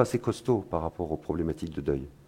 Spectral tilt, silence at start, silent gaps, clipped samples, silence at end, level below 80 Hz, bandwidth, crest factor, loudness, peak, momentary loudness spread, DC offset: -7.5 dB/octave; 0 s; none; under 0.1%; 0.15 s; -50 dBFS; 16 kHz; 24 dB; -31 LUFS; -6 dBFS; 5 LU; under 0.1%